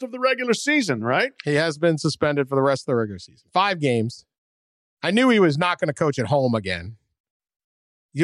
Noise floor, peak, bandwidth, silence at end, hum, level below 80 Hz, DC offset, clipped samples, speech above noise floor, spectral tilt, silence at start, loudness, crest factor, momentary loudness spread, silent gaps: under -90 dBFS; -6 dBFS; 12.5 kHz; 0 s; none; -62 dBFS; under 0.1%; under 0.1%; over 69 dB; -5.5 dB/octave; 0 s; -21 LUFS; 16 dB; 11 LU; 4.38-4.97 s, 7.20-7.24 s, 7.30-7.40 s, 7.64-8.09 s